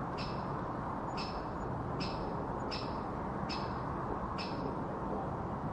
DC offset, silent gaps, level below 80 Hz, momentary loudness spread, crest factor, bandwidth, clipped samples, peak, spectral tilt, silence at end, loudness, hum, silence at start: under 0.1%; none; -50 dBFS; 1 LU; 14 dB; 11 kHz; under 0.1%; -24 dBFS; -7 dB/octave; 0 s; -38 LUFS; none; 0 s